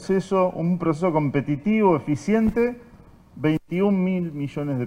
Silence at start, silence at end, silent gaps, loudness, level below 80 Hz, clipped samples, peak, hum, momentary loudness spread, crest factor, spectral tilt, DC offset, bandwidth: 0 s; 0 s; none; -23 LUFS; -48 dBFS; under 0.1%; -6 dBFS; none; 7 LU; 16 dB; -8 dB/octave; under 0.1%; 10 kHz